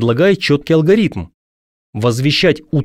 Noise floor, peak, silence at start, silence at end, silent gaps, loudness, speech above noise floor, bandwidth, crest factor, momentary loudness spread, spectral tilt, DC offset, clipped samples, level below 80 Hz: under -90 dBFS; -2 dBFS; 0 s; 0 s; 1.34-1.93 s; -14 LUFS; over 77 dB; 15 kHz; 12 dB; 7 LU; -6 dB/octave; under 0.1%; under 0.1%; -44 dBFS